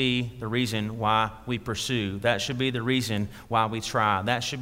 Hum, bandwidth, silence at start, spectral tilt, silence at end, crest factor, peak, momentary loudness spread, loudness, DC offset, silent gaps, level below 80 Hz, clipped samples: none; 16 kHz; 0 s; -4.5 dB/octave; 0 s; 18 dB; -8 dBFS; 5 LU; -27 LUFS; under 0.1%; none; -52 dBFS; under 0.1%